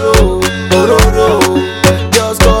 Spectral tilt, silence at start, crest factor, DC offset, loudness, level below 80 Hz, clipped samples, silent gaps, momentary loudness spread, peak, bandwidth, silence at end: -4.5 dB/octave; 0 s; 8 dB; under 0.1%; -10 LUFS; -16 dBFS; 0.2%; none; 3 LU; 0 dBFS; 18 kHz; 0 s